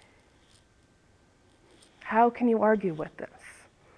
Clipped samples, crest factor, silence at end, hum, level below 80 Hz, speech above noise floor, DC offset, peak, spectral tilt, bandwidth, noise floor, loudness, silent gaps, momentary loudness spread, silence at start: under 0.1%; 20 dB; 0.45 s; none; -66 dBFS; 37 dB; under 0.1%; -10 dBFS; -7.5 dB/octave; 11 kHz; -63 dBFS; -26 LUFS; none; 23 LU; 2.05 s